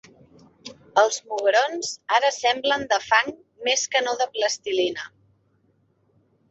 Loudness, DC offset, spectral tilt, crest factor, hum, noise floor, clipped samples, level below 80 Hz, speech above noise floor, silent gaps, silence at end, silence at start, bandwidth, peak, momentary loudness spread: -22 LUFS; under 0.1%; -0.5 dB/octave; 20 dB; none; -65 dBFS; under 0.1%; -68 dBFS; 43 dB; none; 1.45 s; 0.65 s; 8.2 kHz; -4 dBFS; 12 LU